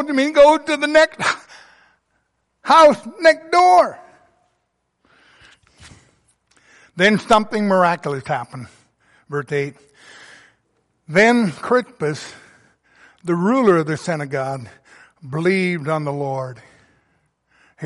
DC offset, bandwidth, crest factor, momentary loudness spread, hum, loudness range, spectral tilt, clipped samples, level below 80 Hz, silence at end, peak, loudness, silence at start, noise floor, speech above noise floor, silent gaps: under 0.1%; 11.5 kHz; 18 dB; 17 LU; none; 8 LU; -5.5 dB/octave; under 0.1%; -56 dBFS; 0 s; -2 dBFS; -17 LUFS; 0 s; -71 dBFS; 54 dB; none